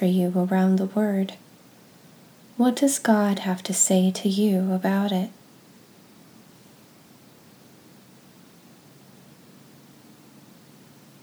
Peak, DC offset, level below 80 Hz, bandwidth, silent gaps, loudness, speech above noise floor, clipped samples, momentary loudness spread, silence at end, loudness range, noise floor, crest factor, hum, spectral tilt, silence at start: -6 dBFS; under 0.1%; -80 dBFS; over 20 kHz; none; -22 LUFS; 30 dB; under 0.1%; 8 LU; 5.95 s; 9 LU; -52 dBFS; 20 dB; none; -5 dB/octave; 0 s